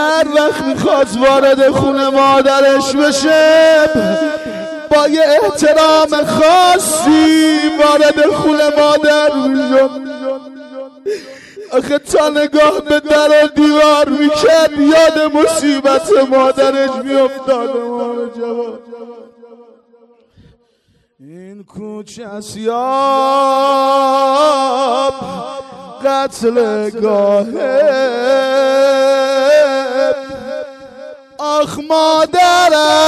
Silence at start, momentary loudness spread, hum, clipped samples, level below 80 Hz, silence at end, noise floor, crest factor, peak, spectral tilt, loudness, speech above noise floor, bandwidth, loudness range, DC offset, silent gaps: 0 s; 15 LU; none; under 0.1%; -48 dBFS; 0 s; -57 dBFS; 10 dB; -2 dBFS; -3.5 dB/octave; -11 LUFS; 46 dB; 14 kHz; 7 LU; under 0.1%; none